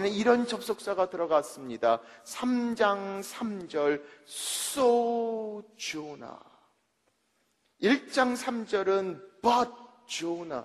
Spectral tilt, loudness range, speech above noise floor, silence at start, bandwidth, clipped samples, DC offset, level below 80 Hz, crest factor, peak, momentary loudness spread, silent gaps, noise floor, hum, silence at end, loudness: -3.5 dB/octave; 3 LU; 45 dB; 0 s; 14 kHz; under 0.1%; under 0.1%; -72 dBFS; 20 dB; -10 dBFS; 12 LU; none; -74 dBFS; none; 0 s; -29 LUFS